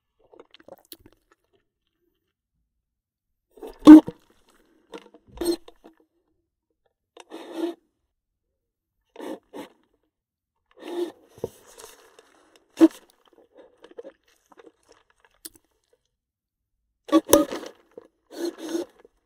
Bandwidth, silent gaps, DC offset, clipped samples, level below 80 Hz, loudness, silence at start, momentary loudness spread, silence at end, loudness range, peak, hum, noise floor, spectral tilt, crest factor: 16 kHz; none; under 0.1%; under 0.1%; -58 dBFS; -18 LUFS; 3.65 s; 32 LU; 0.4 s; 21 LU; 0 dBFS; none; -85 dBFS; -4.5 dB/octave; 26 dB